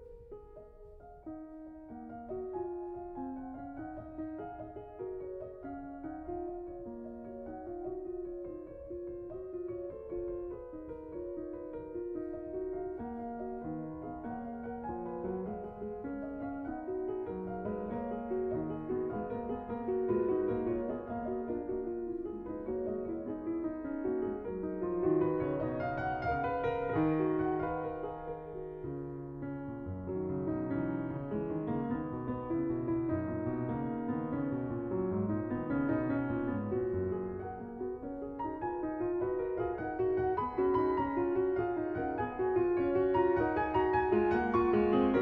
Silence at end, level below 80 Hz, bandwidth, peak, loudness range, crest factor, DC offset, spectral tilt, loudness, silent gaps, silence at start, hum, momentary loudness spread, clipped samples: 0 s; -56 dBFS; 4.9 kHz; -18 dBFS; 11 LU; 18 dB; under 0.1%; -10.5 dB/octave; -36 LUFS; none; 0 s; none; 14 LU; under 0.1%